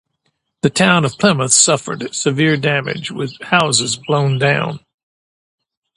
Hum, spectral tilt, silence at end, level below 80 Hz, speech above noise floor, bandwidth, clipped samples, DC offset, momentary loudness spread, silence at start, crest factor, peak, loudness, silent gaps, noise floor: none; -3.5 dB/octave; 1.2 s; -56 dBFS; 53 dB; 11.5 kHz; under 0.1%; under 0.1%; 13 LU; 0.65 s; 16 dB; 0 dBFS; -15 LUFS; none; -69 dBFS